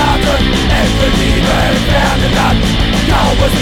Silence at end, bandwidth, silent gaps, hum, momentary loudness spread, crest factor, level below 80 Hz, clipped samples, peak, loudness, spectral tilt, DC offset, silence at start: 0 s; 17 kHz; none; none; 1 LU; 10 dB; -16 dBFS; under 0.1%; 0 dBFS; -11 LUFS; -5 dB/octave; under 0.1%; 0 s